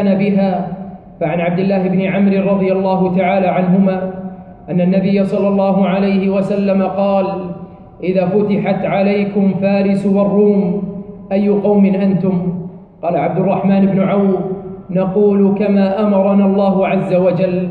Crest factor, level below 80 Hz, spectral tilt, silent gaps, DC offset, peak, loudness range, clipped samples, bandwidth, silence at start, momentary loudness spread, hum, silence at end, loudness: 12 dB; -50 dBFS; -10 dB/octave; none; under 0.1%; -2 dBFS; 2 LU; under 0.1%; 4.8 kHz; 0 s; 11 LU; none; 0 s; -14 LUFS